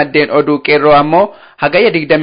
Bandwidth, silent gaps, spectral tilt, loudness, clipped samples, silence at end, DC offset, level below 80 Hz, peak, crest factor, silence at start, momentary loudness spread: 5.2 kHz; none; -11 dB/octave; -10 LUFS; under 0.1%; 0 s; under 0.1%; -48 dBFS; 0 dBFS; 10 dB; 0 s; 6 LU